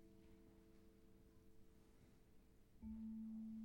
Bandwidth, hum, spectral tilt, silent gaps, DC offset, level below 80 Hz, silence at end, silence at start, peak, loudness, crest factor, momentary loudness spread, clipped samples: 16.5 kHz; none; -8 dB/octave; none; under 0.1%; -70 dBFS; 0 s; 0 s; -44 dBFS; -54 LUFS; 14 dB; 16 LU; under 0.1%